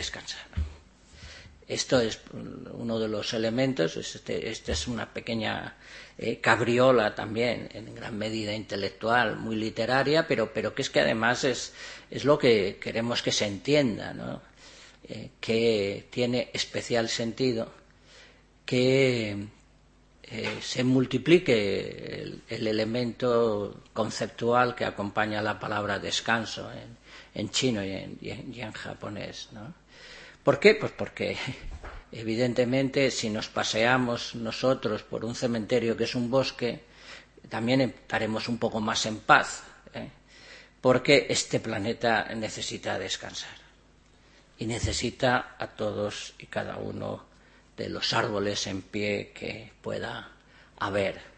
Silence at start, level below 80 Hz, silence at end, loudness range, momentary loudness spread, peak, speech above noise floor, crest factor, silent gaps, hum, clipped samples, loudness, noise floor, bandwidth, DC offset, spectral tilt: 0 s; -52 dBFS; 0.05 s; 5 LU; 18 LU; -4 dBFS; 31 dB; 26 dB; none; none; under 0.1%; -28 LUFS; -59 dBFS; 8.8 kHz; under 0.1%; -4.5 dB/octave